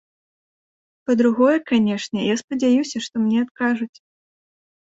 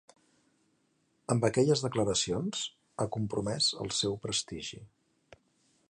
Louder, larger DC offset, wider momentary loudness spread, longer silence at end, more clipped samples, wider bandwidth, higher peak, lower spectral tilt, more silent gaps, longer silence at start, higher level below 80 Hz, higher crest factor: first, -20 LUFS vs -31 LUFS; neither; second, 9 LU vs 13 LU; about the same, 1 s vs 1.05 s; neither; second, 8 kHz vs 11.5 kHz; first, -4 dBFS vs -12 dBFS; about the same, -5 dB/octave vs -4 dB/octave; first, 2.44-2.48 s, 3.51-3.55 s vs none; second, 1.1 s vs 1.3 s; about the same, -66 dBFS vs -62 dBFS; about the same, 16 dB vs 20 dB